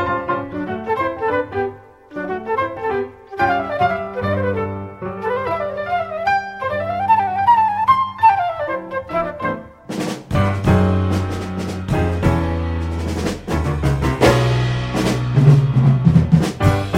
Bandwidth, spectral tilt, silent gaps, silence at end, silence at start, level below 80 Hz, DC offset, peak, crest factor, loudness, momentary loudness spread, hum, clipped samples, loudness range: 15.5 kHz; -7 dB/octave; none; 0 s; 0 s; -34 dBFS; under 0.1%; 0 dBFS; 16 dB; -18 LUFS; 11 LU; none; under 0.1%; 6 LU